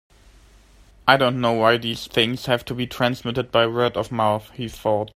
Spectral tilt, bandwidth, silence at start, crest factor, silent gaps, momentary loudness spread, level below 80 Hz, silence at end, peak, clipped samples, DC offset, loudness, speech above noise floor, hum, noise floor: -5.5 dB/octave; 16 kHz; 1.05 s; 22 dB; none; 9 LU; -50 dBFS; 0.05 s; 0 dBFS; under 0.1%; under 0.1%; -21 LUFS; 30 dB; none; -51 dBFS